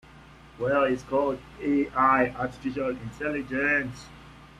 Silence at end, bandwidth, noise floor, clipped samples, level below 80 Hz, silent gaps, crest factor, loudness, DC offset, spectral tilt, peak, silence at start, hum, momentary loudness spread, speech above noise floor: 0.15 s; 11 kHz; -50 dBFS; under 0.1%; -52 dBFS; none; 18 dB; -26 LUFS; under 0.1%; -6.5 dB/octave; -8 dBFS; 0.15 s; none; 11 LU; 24 dB